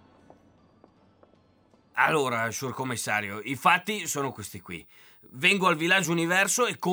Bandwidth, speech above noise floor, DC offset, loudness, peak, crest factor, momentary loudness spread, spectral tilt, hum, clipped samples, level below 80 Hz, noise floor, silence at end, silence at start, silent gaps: over 20 kHz; 35 dB; under 0.1%; -25 LUFS; -6 dBFS; 22 dB; 17 LU; -3 dB/octave; none; under 0.1%; -72 dBFS; -62 dBFS; 0 s; 1.95 s; none